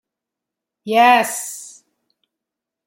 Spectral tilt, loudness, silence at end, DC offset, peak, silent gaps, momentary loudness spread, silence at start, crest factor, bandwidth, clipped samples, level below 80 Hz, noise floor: -2 dB/octave; -15 LUFS; 1.2 s; under 0.1%; -2 dBFS; none; 21 LU; 0.85 s; 20 dB; 16.5 kHz; under 0.1%; -76 dBFS; -84 dBFS